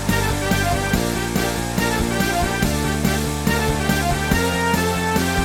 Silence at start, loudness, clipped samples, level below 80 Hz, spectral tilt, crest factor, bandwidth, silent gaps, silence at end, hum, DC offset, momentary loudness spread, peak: 0 s; -20 LUFS; under 0.1%; -30 dBFS; -4.5 dB/octave; 16 dB; over 20 kHz; none; 0 s; none; under 0.1%; 2 LU; -4 dBFS